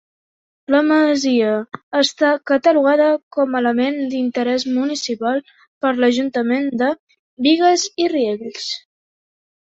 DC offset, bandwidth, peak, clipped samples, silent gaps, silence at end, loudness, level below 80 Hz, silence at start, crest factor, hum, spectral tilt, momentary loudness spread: under 0.1%; 8 kHz; -2 dBFS; under 0.1%; 1.83-1.91 s, 3.23-3.31 s, 5.68-5.81 s, 6.99-7.07 s, 7.19-7.37 s; 0.85 s; -18 LUFS; -66 dBFS; 0.7 s; 16 dB; none; -3 dB/octave; 10 LU